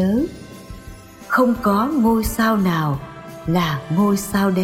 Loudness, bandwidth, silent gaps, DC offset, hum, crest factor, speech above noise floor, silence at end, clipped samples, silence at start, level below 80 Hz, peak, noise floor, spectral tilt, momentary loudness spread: -19 LUFS; 16.5 kHz; none; under 0.1%; none; 14 dB; 21 dB; 0 s; under 0.1%; 0 s; -38 dBFS; -4 dBFS; -39 dBFS; -6 dB/octave; 20 LU